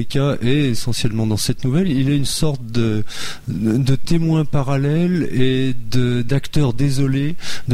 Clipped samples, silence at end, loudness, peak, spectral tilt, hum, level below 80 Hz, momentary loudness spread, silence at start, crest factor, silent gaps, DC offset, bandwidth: under 0.1%; 0 s; -19 LUFS; -4 dBFS; -6 dB/octave; none; -34 dBFS; 4 LU; 0 s; 12 dB; none; under 0.1%; 15.5 kHz